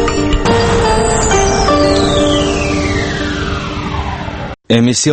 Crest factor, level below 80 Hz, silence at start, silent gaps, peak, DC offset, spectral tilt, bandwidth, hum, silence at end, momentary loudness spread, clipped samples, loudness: 12 dB; -22 dBFS; 0 s; none; 0 dBFS; under 0.1%; -4.5 dB/octave; 8.8 kHz; none; 0 s; 9 LU; under 0.1%; -13 LUFS